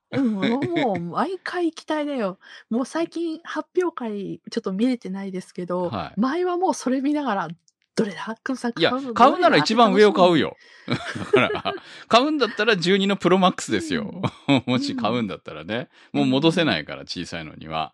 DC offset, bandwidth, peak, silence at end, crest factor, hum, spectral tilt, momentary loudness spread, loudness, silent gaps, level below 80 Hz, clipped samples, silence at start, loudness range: under 0.1%; 11.5 kHz; -2 dBFS; 0.05 s; 20 dB; none; -5.5 dB/octave; 13 LU; -22 LUFS; none; -62 dBFS; under 0.1%; 0.1 s; 8 LU